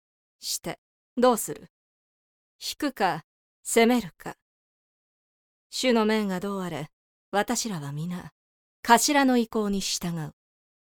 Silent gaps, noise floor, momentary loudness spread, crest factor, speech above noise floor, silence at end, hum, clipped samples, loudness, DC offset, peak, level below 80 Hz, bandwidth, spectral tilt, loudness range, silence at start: 0.78-1.16 s, 1.70-2.59 s, 3.24-3.63 s, 4.42-5.70 s, 6.93-7.32 s, 8.32-8.83 s; under -90 dBFS; 18 LU; 24 dB; over 65 dB; 0.55 s; none; under 0.1%; -26 LUFS; under 0.1%; -2 dBFS; -58 dBFS; 19.5 kHz; -3.5 dB/octave; 4 LU; 0.4 s